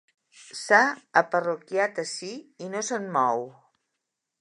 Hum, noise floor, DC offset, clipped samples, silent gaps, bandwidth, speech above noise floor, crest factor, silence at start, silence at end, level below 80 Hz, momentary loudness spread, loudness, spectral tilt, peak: none; -83 dBFS; under 0.1%; under 0.1%; none; 11 kHz; 57 dB; 24 dB; 0.4 s; 0.9 s; -84 dBFS; 18 LU; -25 LUFS; -3 dB/octave; -4 dBFS